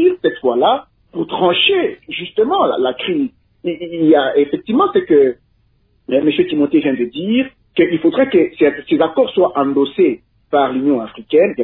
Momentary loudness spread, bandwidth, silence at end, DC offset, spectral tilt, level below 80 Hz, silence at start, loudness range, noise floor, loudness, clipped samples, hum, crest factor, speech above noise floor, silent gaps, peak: 9 LU; 4.1 kHz; 0 s; under 0.1%; -9 dB/octave; -56 dBFS; 0 s; 2 LU; -57 dBFS; -15 LUFS; under 0.1%; none; 14 dB; 43 dB; none; -2 dBFS